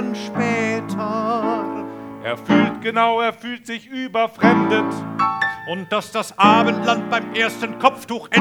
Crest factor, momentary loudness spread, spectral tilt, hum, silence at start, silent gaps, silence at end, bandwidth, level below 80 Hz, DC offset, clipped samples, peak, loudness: 20 dB; 12 LU; -5 dB/octave; none; 0 s; none; 0 s; 16.5 kHz; -64 dBFS; under 0.1%; under 0.1%; 0 dBFS; -19 LUFS